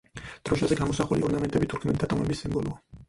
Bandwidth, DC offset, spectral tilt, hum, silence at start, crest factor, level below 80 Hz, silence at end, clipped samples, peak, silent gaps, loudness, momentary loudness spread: 11.5 kHz; under 0.1%; -6.5 dB/octave; none; 0.15 s; 18 dB; -46 dBFS; 0.05 s; under 0.1%; -10 dBFS; none; -27 LUFS; 7 LU